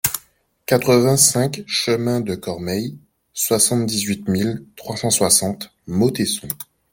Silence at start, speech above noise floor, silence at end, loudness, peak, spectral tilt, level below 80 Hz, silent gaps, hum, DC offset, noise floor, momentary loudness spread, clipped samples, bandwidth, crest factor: 0.05 s; 37 dB; 0.3 s; -18 LUFS; 0 dBFS; -3.5 dB/octave; -54 dBFS; none; none; under 0.1%; -55 dBFS; 16 LU; under 0.1%; 17 kHz; 20 dB